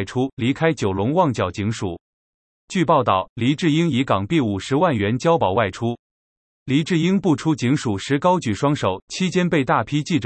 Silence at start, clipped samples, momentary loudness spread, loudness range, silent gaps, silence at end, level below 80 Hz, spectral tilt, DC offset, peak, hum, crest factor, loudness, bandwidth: 0 s; under 0.1%; 7 LU; 2 LU; 0.33-0.37 s, 2.00-2.68 s, 3.29-3.36 s, 5.99-6.66 s, 9.02-9.08 s; 0 s; -56 dBFS; -6 dB/octave; under 0.1%; -4 dBFS; none; 16 dB; -20 LUFS; 8.8 kHz